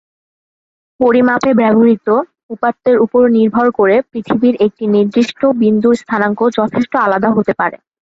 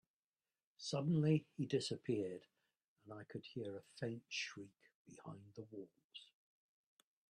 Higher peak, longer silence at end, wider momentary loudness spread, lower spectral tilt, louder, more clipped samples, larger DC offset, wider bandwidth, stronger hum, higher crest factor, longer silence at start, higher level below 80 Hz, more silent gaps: first, 0 dBFS vs -24 dBFS; second, 0.45 s vs 1.05 s; second, 6 LU vs 21 LU; about the same, -7 dB/octave vs -6 dB/octave; first, -13 LUFS vs -42 LUFS; neither; neither; second, 7.8 kHz vs 10 kHz; neither; second, 12 dB vs 22 dB; first, 1 s vs 0.8 s; first, -54 dBFS vs -84 dBFS; second, 2.43-2.49 s vs 2.88-2.96 s, 4.95-5.05 s, 6.04-6.10 s